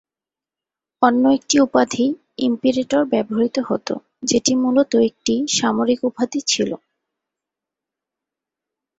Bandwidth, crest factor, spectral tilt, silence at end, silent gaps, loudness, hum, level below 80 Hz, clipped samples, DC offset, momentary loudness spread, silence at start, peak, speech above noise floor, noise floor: 8 kHz; 18 dB; -3.5 dB/octave; 2.25 s; none; -19 LUFS; none; -60 dBFS; under 0.1%; under 0.1%; 8 LU; 1 s; -2 dBFS; 72 dB; -90 dBFS